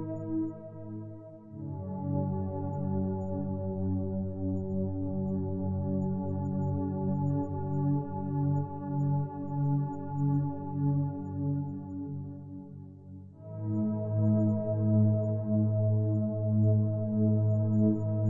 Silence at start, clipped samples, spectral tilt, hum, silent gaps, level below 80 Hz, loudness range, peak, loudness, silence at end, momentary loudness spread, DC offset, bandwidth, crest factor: 0 s; under 0.1%; -14 dB/octave; none; none; -66 dBFS; 7 LU; -16 dBFS; -31 LUFS; 0 s; 15 LU; under 0.1%; 1.8 kHz; 14 dB